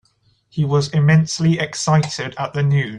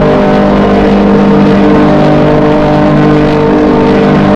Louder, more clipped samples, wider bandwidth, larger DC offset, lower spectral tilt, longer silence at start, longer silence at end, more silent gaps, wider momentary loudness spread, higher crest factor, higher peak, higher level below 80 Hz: second, -18 LUFS vs -6 LUFS; neither; first, 10 kHz vs 8 kHz; neither; second, -6 dB/octave vs -8.5 dB/octave; first, 0.55 s vs 0 s; about the same, 0 s vs 0 s; neither; first, 10 LU vs 1 LU; first, 14 dB vs 6 dB; second, -4 dBFS vs 0 dBFS; second, -52 dBFS vs -24 dBFS